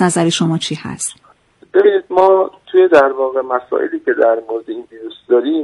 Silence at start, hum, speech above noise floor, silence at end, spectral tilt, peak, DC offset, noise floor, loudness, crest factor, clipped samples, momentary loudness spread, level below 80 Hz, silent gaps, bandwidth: 0 s; none; 35 dB; 0 s; -5 dB/octave; 0 dBFS; under 0.1%; -49 dBFS; -14 LUFS; 14 dB; under 0.1%; 13 LU; -58 dBFS; none; 11.5 kHz